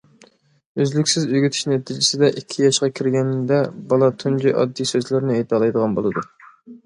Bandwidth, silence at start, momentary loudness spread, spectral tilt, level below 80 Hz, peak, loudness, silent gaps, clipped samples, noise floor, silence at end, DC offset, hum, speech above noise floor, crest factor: 11 kHz; 0.75 s; 5 LU; -5 dB/octave; -62 dBFS; -4 dBFS; -19 LUFS; none; under 0.1%; -53 dBFS; 0.1 s; under 0.1%; none; 35 dB; 16 dB